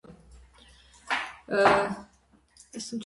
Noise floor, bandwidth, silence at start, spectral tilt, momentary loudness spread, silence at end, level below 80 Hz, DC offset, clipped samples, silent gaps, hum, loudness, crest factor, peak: -62 dBFS; 11.5 kHz; 0.1 s; -4 dB/octave; 18 LU; 0 s; -58 dBFS; under 0.1%; under 0.1%; none; none; -26 LUFS; 22 dB; -8 dBFS